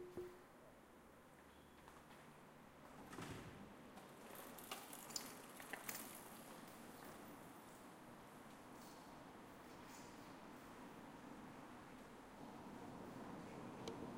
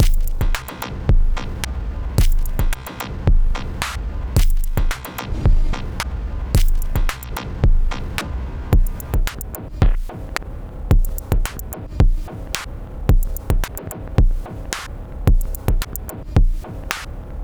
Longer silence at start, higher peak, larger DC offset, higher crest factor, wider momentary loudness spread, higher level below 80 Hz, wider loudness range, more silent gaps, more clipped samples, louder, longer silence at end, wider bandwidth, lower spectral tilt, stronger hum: about the same, 0 s vs 0 s; second, -28 dBFS vs 0 dBFS; neither; first, 30 dB vs 18 dB; first, 12 LU vs 9 LU; second, -78 dBFS vs -18 dBFS; first, 6 LU vs 1 LU; neither; neither; second, -57 LUFS vs -23 LUFS; about the same, 0 s vs 0 s; second, 16 kHz vs over 20 kHz; second, -3.5 dB/octave vs -5.5 dB/octave; neither